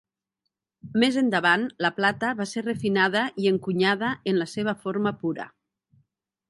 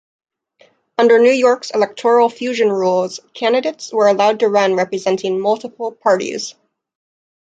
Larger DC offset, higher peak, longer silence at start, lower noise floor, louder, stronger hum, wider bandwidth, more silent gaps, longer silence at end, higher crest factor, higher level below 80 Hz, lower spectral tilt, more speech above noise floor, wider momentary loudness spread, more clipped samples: neither; second, -6 dBFS vs -2 dBFS; second, 0.85 s vs 1 s; first, -82 dBFS vs -54 dBFS; second, -24 LUFS vs -16 LUFS; neither; first, 11.5 kHz vs 9 kHz; neither; about the same, 1 s vs 1 s; first, 20 dB vs 14 dB; about the same, -68 dBFS vs -68 dBFS; first, -5.5 dB/octave vs -4 dB/octave; first, 58 dB vs 39 dB; about the same, 8 LU vs 10 LU; neither